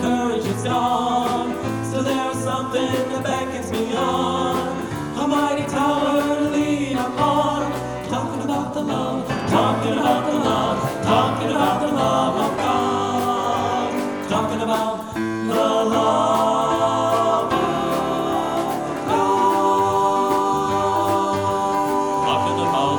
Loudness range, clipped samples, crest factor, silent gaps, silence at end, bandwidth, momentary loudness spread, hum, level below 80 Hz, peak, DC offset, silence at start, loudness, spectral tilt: 3 LU; under 0.1%; 16 dB; none; 0 s; over 20 kHz; 6 LU; none; -50 dBFS; -4 dBFS; under 0.1%; 0 s; -20 LUFS; -5 dB/octave